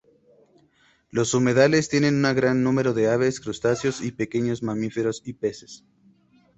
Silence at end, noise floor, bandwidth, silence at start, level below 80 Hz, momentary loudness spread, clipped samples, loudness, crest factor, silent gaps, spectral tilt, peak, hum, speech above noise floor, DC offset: 0.8 s; -61 dBFS; 8.2 kHz; 1.15 s; -58 dBFS; 11 LU; under 0.1%; -23 LUFS; 20 dB; none; -5.5 dB/octave; -4 dBFS; none; 39 dB; under 0.1%